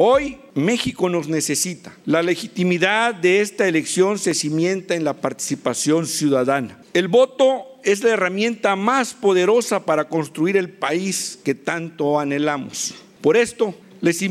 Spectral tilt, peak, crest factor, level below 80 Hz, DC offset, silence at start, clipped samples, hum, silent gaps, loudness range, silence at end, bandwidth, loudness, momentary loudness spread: -4 dB/octave; -4 dBFS; 14 dB; -58 dBFS; under 0.1%; 0 s; under 0.1%; none; none; 3 LU; 0 s; 15.5 kHz; -20 LUFS; 7 LU